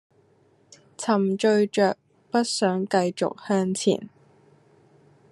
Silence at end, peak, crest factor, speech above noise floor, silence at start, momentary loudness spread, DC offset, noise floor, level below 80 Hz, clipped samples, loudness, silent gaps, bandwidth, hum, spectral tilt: 1.25 s; -8 dBFS; 18 dB; 38 dB; 1 s; 9 LU; under 0.1%; -61 dBFS; -76 dBFS; under 0.1%; -24 LUFS; none; 12 kHz; none; -5 dB/octave